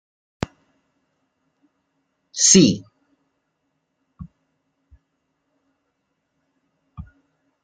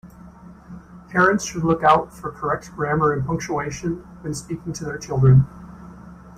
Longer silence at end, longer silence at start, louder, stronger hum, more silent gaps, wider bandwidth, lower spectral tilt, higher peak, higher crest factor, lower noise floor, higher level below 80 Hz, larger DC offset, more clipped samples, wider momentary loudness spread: first, 0.6 s vs 0 s; first, 2.35 s vs 0.05 s; first, -14 LUFS vs -21 LUFS; neither; neither; about the same, 10 kHz vs 9.8 kHz; second, -3.5 dB/octave vs -6.5 dB/octave; about the same, -2 dBFS vs -4 dBFS; first, 24 dB vs 18 dB; first, -74 dBFS vs -43 dBFS; second, -54 dBFS vs -44 dBFS; neither; neither; second, 20 LU vs 25 LU